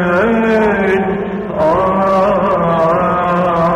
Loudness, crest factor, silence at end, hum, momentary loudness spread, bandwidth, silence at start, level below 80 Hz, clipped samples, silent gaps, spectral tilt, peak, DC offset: -13 LUFS; 10 dB; 0 s; none; 3 LU; 10.5 kHz; 0 s; -38 dBFS; under 0.1%; none; -8 dB/octave; -2 dBFS; under 0.1%